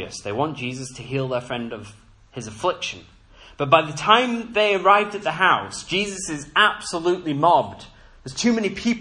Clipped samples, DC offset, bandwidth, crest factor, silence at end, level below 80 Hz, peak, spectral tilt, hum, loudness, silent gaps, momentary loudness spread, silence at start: under 0.1%; under 0.1%; 11 kHz; 22 dB; 0 s; -54 dBFS; 0 dBFS; -4 dB/octave; none; -21 LUFS; none; 16 LU; 0 s